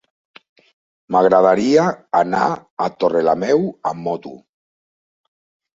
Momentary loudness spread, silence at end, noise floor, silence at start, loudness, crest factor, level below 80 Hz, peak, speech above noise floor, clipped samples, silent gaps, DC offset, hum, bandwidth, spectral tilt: 12 LU; 1.4 s; under -90 dBFS; 1.1 s; -17 LUFS; 18 dB; -60 dBFS; -2 dBFS; over 73 dB; under 0.1%; 2.71-2.77 s; under 0.1%; none; 7.8 kHz; -6 dB/octave